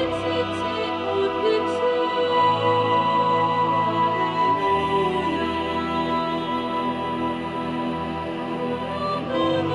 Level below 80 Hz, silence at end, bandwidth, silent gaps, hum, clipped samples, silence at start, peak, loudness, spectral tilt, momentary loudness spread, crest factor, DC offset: -52 dBFS; 0 s; 11 kHz; none; none; under 0.1%; 0 s; -10 dBFS; -23 LUFS; -6.5 dB/octave; 7 LU; 14 dB; under 0.1%